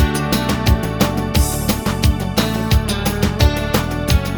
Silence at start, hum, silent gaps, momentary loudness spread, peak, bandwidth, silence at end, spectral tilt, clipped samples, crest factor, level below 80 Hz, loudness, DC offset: 0 s; none; none; 3 LU; -2 dBFS; over 20 kHz; 0 s; -5 dB/octave; under 0.1%; 16 dB; -22 dBFS; -17 LUFS; under 0.1%